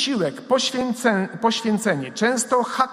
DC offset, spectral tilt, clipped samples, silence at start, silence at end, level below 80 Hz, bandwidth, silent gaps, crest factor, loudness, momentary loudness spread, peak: under 0.1%; -3.5 dB/octave; under 0.1%; 0 s; 0 s; -64 dBFS; 16 kHz; none; 18 dB; -21 LUFS; 2 LU; -2 dBFS